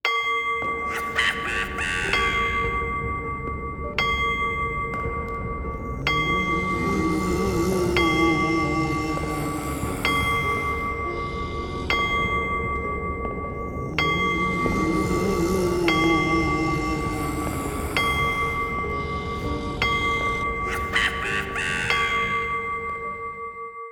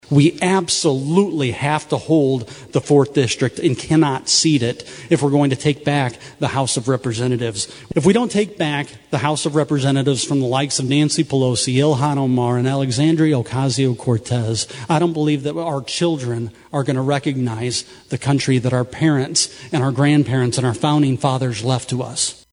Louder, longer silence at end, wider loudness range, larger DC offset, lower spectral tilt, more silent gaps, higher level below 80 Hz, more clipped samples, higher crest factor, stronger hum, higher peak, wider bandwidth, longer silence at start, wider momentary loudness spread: second, -24 LUFS vs -18 LUFS; second, 0 s vs 0.2 s; about the same, 3 LU vs 3 LU; neither; about the same, -5 dB/octave vs -5 dB/octave; neither; first, -36 dBFS vs -54 dBFS; neither; about the same, 18 dB vs 16 dB; neither; second, -6 dBFS vs -2 dBFS; first, over 20 kHz vs 11 kHz; about the same, 0.05 s vs 0.1 s; about the same, 8 LU vs 7 LU